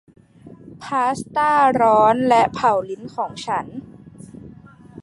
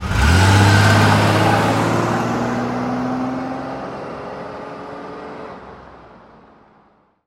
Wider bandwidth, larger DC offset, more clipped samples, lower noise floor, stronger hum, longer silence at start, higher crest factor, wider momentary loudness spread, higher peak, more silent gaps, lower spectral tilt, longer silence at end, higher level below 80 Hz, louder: second, 11.5 kHz vs 16 kHz; neither; neither; second, -44 dBFS vs -55 dBFS; neither; first, 0.45 s vs 0 s; about the same, 18 dB vs 18 dB; about the same, 22 LU vs 20 LU; about the same, -2 dBFS vs 0 dBFS; neither; about the same, -5.5 dB/octave vs -5.5 dB/octave; second, 0 s vs 1.2 s; second, -56 dBFS vs -32 dBFS; about the same, -18 LUFS vs -16 LUFS